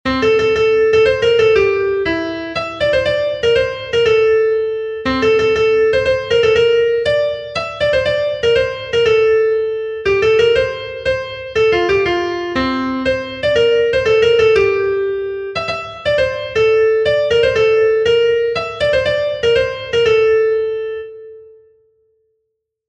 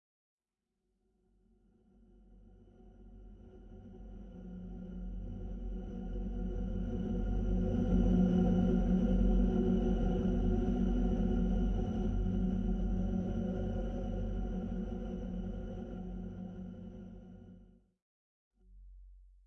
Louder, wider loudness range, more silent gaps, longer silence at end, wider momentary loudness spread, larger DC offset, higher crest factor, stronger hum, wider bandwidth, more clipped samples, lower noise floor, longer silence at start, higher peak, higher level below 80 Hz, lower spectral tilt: first, -15 LUFS vs -35 LUFS; second, 2 LU vs 18 LU; second, none vs 18.02-18.51 s; first, 1.45 s vs 0.2 s; second, 8 LU vs 20 LU; neither; about the same, 14 dB vs 18 dB; neither; first, 8.4 kHz vs 6.2 kHz; neither; second, -73 dBFS vs -88 dBFS; second, 0.05 s vs 2.3 s; first, -2 dBFS vs -18 dBFS; about the same, -40 dBFS vs -38 dBFS; second, -5 dB/octave vs -10 dB/octave